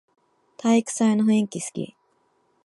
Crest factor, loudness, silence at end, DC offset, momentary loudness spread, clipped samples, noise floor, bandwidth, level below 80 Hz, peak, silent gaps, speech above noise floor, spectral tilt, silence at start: 16 dB; -22 LUFS; 0.8 s; under 0.1%; 13 LU; under 0.1%; -67 dBFS; 11.5 kHz; -74 dBFS; -8 dBFS; none; 45 dB; -5 dB/octave; 0.65 s